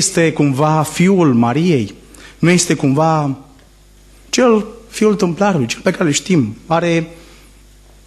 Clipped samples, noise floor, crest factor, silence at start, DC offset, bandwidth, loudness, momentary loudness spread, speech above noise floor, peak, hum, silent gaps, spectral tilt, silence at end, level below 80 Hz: under 0.1%; -45 dBFS; 14 dB; 0 s; under 0.1%; 13 kHz; -14 LUFS; 7 LU; 31 dB; -2 dBFS; none; none; -5 dB/octave; 0.9 s; -46 dBFS